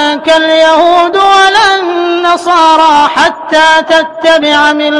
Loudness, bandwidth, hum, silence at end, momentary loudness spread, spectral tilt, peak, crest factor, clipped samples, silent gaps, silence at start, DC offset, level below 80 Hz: -6 LUFS; 11.5 kHz; none; 0 s; 5 LU; -2 dB/octave; 0 dBFS; 6 dB; 0.5%; none; 0 s; 0.6%; -46 dBFS